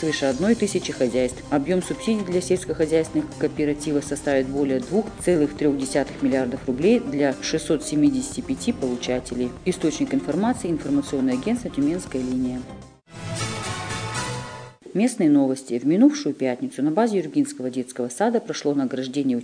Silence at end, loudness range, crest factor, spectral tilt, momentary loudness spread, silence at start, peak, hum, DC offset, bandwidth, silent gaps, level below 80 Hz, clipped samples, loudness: 0 s; 4 LU; 18 dB; -5.5 dB/octave; 8 LU; 0 s; -6 dBFS; none; under 0.1%; 10 kHz; none; -48 dBFS; under 0.1%; -23 LUFS